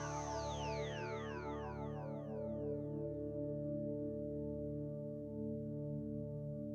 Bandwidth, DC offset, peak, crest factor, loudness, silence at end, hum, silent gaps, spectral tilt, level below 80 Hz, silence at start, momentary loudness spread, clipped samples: 8 kHz; under 0.1%; -30 dBFS; 12 dB; -44 LUFS; 0 s; none; none; -6.5 dB/octave; -58 dBFS; 0 s; 3 LU; under 0.1%